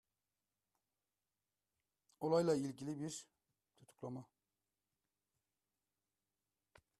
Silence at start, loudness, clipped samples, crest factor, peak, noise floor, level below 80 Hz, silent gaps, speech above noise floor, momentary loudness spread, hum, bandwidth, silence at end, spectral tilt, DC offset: 2.2 s; -41 LUFS; under 0.1%; 22 dB; -24 dBFS; under -90 dBFS; -84 dBFS; none; over 50 dB; 17 LU; 50 Hz at -85 dBFS; 13 kHz; 2.75 s; -6 dB/octave; under 0.1%